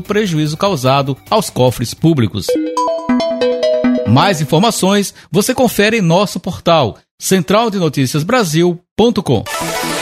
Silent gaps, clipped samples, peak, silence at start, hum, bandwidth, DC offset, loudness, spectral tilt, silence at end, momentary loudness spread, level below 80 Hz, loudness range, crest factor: 7.11-7.18 s, 8.91-8.96 s; under 0.1%; 0 dBFS; 0 s; none; 16 kHz; under 0.1%; -14 LUFS; -5 dB/octave; 0 s; 5 LU; -46 dBFS; 2 LU; 14 dB